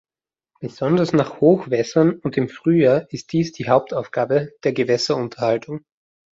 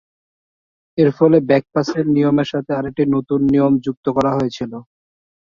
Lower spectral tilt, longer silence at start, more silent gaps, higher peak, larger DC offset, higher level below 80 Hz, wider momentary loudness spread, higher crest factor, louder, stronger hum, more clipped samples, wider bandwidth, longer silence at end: second, -6.5 dB/octave vs -8 dB/octave; second, 0.6 s vs 0.95 s; second, none vs 3.97-4.03 s; about the same, -2 dBFS vs -2 dBFS; neither; second, -60 dBFS vs -52 dBFS; about the same, 9 LU vs 9 LU; about the same, 18 dB vs 16 dB; about the same, -19 LUFS vs -17 LUFS; neither; neither; about the same, 7.8 kHz vs 7.2 kHz; about the same, 0.6 s vs 0.6 s